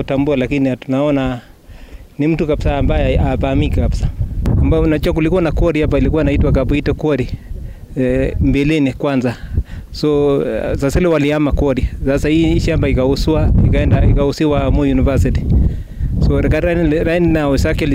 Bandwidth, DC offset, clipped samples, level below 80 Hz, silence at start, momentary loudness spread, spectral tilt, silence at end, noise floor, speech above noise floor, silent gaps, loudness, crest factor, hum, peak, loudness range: 15.5 kHz; under 0.1%; under 0.1%; -20 dBFS; 0 s; 6 LU; -7.5 dB/octave; 0 s; -35 dBFS; 21 dB; none; -15 LUFS; 10 dB; none; -4 dBFS; 3 LU